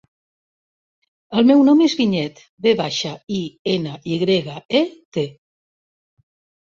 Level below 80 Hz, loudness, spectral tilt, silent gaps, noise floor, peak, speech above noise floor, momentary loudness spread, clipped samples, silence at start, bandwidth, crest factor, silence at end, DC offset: -62 dBFS; -19 LUFS; -5.5 dB/octave; 2.49-2.57 s, 3.23-3.27 s, 3.59-3.65 s, 4.65-4.69 s, 5.05-5.12 s; under -90 dBFS; -4 dBFS; over 72 dB; 13 LU; under 0.1%; 1.3 s; 7.4 kHz; 16 dB; 1.35 s; under 0.1%